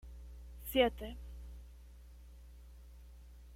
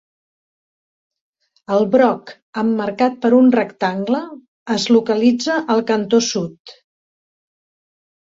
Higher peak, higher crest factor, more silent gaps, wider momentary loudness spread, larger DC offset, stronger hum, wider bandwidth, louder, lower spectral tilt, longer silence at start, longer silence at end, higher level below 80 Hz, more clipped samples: second, -16 dBFS vs -2 dBFS; first, 24 dB vs 16 dB; second, none vs 2.42-2.53 s, 4.48-4.66 s, 6.60-6.65 s; first, 26 LU vs 11 LU; neither; neither; first, 16.5 kHz vs 7.8 kHz; second, -36 LUFS vs -17 LUFS; about the same, -5 dB/octave vs -5 dB/octave; second, 0 s vs 1.7 s; second, 0 s vs 1.6 s; first, -52 dBFS vs -64 dBFS; neither